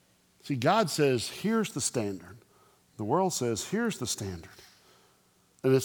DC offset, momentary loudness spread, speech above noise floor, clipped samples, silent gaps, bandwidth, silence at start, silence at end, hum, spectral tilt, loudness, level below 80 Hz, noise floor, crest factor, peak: under 0.1%; 14 LU; 36 dB; under 0.1%; none; 19.5 kHz; 0.45 s; 0 s; none; -4.5 dB/octave; -29 LUFS; -66 dBFS; -66 dBFS; 20 dB; -10 dBFS